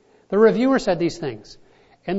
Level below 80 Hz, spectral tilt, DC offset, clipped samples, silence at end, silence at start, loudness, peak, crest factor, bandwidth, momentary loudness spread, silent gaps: -52 dBFS; -6.5 dB/octave; under 0.1%; under 0.1%; 0 s; 0.3 s; -19 LUFS; -4 dBFS; 16 dB; 8 kHz; 18 LU; none